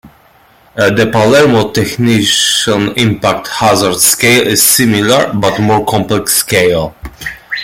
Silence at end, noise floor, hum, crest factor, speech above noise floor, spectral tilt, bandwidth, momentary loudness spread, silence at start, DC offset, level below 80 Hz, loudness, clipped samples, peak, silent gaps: 0 s; -45 dBFS; none; 10 dB; 35 dB; -3.5 dB/octave; over 20 kHz; 8 LU; 0.05 s; under 0.1%; -40 dBFS; -9 LUFS; under 0.1%; 0 dBFS; none